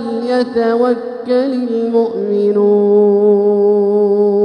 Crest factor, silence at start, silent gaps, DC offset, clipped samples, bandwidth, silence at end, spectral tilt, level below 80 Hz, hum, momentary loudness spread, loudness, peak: 10 dB; 0 s; none; under 0.1%; under 0.1%; 5.6 kHz; 0 s; -8.5 dB/octave; -62 dBFS; none; 6 LU; -13 LUFS; -2 dBFS